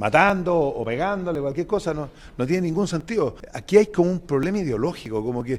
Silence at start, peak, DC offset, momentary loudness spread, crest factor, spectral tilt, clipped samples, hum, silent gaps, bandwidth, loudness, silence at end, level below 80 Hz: 0 s; -2 dBFS; under 0.1%; 10 LU; 20 dB; -6.5 dB/octave; under 0.1%; none; none; 13.5 kHz; -23 LUFS; 0 s; -46 dBFS